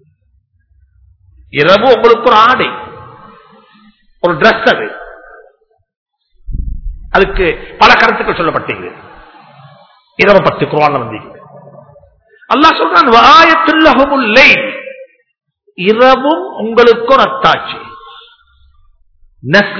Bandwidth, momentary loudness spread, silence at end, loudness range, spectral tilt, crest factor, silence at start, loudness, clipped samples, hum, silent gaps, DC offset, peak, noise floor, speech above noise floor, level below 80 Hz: 5.4 kHz; 20 LU; 0 s; 9 LU; -5 dB/octave; 12 dB; 1.55 s; -8 LUFS; 3%; none; 5.96-6.06 s; under 0.1%; 0 dBFS; -55 dBFS; 46 dB; -32 dBFS